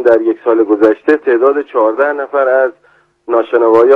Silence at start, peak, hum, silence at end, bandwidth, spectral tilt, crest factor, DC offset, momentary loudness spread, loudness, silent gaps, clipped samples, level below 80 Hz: 0 s; 0 dBFS; none; 0 s; 5.6 kHz; -7 dB/octave; 10 dB; under 0.1%; 5 LU; -12 LUFS; none; 0.7%; -60 dBFS